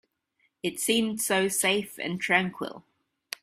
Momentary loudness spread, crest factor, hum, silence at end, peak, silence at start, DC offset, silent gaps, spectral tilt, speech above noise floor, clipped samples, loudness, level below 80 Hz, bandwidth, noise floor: 13 LU; 22 dB; none; 0.6 s; -6 dBFS; 0.65 s; under 0.1%; none; -2.5 dB/octave; 46 dB; under 0.1%; -26 LUFS; -70 dBFS; 16 kHz; -73 dBFS